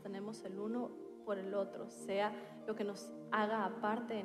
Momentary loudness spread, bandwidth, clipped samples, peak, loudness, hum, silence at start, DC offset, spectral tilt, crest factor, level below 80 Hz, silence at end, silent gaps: 10 LU; 14 kHz; under 0.1%; -20 dBFS; -41 LUFS; none; 0 s; under 0.1%; -5.5 dB/octave; 20 dB; -84 dBFS; 0 s; none